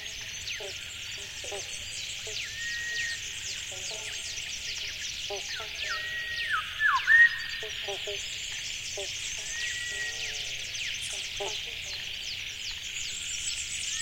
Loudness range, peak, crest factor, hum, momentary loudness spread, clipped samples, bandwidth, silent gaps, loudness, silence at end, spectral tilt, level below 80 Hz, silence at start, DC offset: 8 LU; -10 dBFS; 22 dB; none; 8 LU; under 0.1%; 16.5 kHz; none; -30 LUFS; 0 s; 1 dB/octave; -56 dBFS; 0 s; under 0.1%